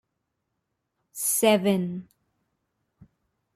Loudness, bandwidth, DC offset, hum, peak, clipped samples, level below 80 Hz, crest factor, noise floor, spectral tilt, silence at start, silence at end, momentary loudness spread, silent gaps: -23 LUFS; 15.5 kHz; under 0.1%; none; -8 dBFS; under 0.1%; -70 dBFS; 22 dB; -80 dBFS; -4 dB/octave; 1.15 s; 1.55 s; 18 LU; none